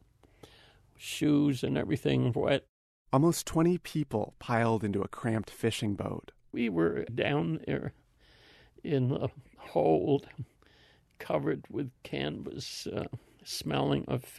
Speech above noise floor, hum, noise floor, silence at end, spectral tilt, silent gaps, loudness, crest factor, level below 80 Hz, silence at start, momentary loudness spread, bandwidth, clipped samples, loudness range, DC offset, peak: 32 dB; none; -63 dBFS; 0 s; -6 dB/octave; 2.69-3.05 s; -31 LUFS; 20 dB; -58 dBFS; 1 s; 12 LU; 13.5 kHz; under 0.1%; 5 LU; under 0.1%; -12 dBFS